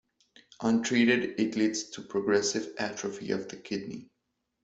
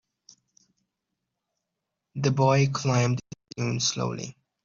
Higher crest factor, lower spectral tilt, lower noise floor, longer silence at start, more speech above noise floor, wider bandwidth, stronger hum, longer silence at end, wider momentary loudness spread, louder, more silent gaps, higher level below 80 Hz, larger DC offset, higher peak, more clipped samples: about the same, 18 dB vs 20 dB; about the same, -4 dB/octave vs -5 dB/octave; about the same, -81 dBFS vs -84 dBFS; second, 0.6 s vs 2.15 s; second, 52 dB vs 60 dB; about the same, 8.2 kHz vs 7.6 kHz; neither; first, 0.6 s vs 0.35 s; second, 12 LU vs 17 LU; second, -29 LUFS vs -25 LUFS; neither; second, -70 dBFS vs -64 dBFS; neither; about the same, -12 dBFS vs -10 dBFS; neither